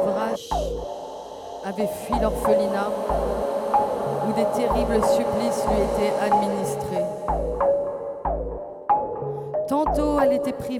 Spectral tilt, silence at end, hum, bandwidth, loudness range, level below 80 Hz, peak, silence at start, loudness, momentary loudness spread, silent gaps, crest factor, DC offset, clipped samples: -6 dB/octave; 0 s; none; 16.5 kHz; 3 LU; -38 dBFS; -8 dBFS; 0 s; -24 LUFS; 9 LU; none; 16 dB; under 0.1%; under 0.1%